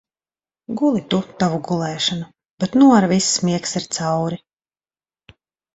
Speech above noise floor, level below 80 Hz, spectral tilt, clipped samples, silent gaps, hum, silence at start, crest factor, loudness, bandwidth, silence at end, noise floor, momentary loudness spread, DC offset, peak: over 72 dB; -58 dBFS; -4.5 dB/octave; under 0.1%; 2.51-2.58 s; none; 0.7 s; 20 dB; -18 LUFS; 8.4 kHz; 1.4 s; under -90 dBFS; 14 LU; under 0.1%; 0 dBFS